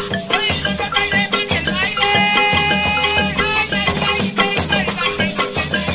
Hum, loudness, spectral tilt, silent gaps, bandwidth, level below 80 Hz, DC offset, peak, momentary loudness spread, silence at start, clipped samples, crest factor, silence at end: none; -16 LUFS; -8 dB/octave; none; 4 kHz; -36 dBFS; under 0.1%; -2 dBFS; 5 LU; 0 s; under 0.1%; 14 dB; 0 s